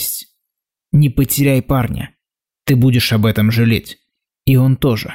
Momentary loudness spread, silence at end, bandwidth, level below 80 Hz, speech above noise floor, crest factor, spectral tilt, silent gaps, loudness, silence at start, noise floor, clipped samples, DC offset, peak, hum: 13 LU; 0 s; 16.5 kHz; -36 dBFS; 69 dB; 12 dB; -6 dB/octave; none; -15 LUFS; 0 s; -82 dBFS; under 0.1%; under 0.1%; -4 dBFS; none